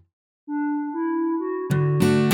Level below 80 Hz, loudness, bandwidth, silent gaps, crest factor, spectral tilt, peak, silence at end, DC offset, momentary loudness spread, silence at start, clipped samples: -58 dBFS; -24 LUFS; 17 kHz; none; 16 dB; -7 dB/octave; -6 dBFS; 0 s; under 0.1%; 8 LU; 0.5 s; under 0.1%